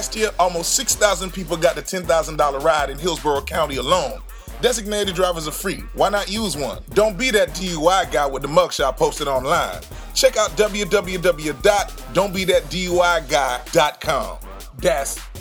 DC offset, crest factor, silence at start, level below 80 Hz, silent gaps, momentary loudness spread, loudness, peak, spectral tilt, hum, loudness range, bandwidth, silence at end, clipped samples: under 0.1%; 20 dB; 0 s; -36 dBFS; none; 7 LU; -20 LUFS; 0 dBFS; -3 dB/octave; none; 2 LU; over 20 kHz; 0 s; under 0.1%